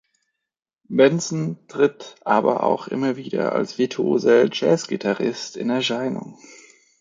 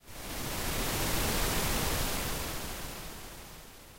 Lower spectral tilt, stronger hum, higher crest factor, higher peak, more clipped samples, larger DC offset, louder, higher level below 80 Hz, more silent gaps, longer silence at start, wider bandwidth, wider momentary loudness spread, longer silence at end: first, -5 dB/octave vs -3 dB/octave; neither; about the same, 20 dB vs 16 dB; first, -2 dBFS vs -18 dBFS; neither; neither; first, -21 LUFS vs -33 LUFS; second, -70 dBFS vs -40 dBFS; neither; first, 0.9 s vs 0.05 s; second, 9.4 kHz vs 16 kHz; second, 10 LU vs 15 LU; first, 0.45 s vs 0 s